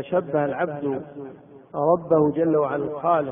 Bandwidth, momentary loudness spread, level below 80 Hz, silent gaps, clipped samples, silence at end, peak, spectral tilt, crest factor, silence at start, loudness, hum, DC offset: 3.7 kHz; 16 LU; -62 dBFS; none; under 0.1%; 0 s; -6 dBFS; -12 dB/octave; 16 dB; 0 s; -23 LUFS; none; under 0.1%